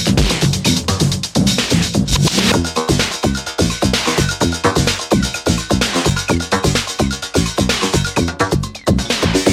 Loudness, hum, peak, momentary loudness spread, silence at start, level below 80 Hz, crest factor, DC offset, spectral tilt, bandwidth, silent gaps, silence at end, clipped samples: -16 LUFS; none; 0 dBFS; 4 LU; 0 s; -28 dBFS; 16 dB; under 0.1%; -4 dB/octave; 16 kHz; none; 0 s; under 0.1%